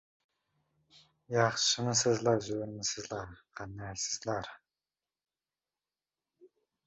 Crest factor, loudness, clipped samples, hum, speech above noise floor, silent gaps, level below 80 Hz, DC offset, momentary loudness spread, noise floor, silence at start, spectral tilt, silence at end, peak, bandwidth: 22 dB; -32 LUFS; under 0.1%; none; over 57 dB; none; -66 dBFS; under 0.1%; 17 LU; under -90 dBFS; 0.95 s; -3.5 dB/octave; 0.4 s; -14 dBFS; 8 kHz